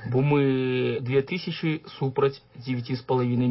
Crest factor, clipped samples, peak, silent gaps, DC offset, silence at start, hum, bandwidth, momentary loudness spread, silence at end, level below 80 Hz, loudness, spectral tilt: 14 dB; under 0.1%; -10 dBFS; none; under 0.1%; 0 s; none; 5.8 kHz; 8 LU; 0 s; -62 dBFS; -26 LUFS; -11.5 dB/octave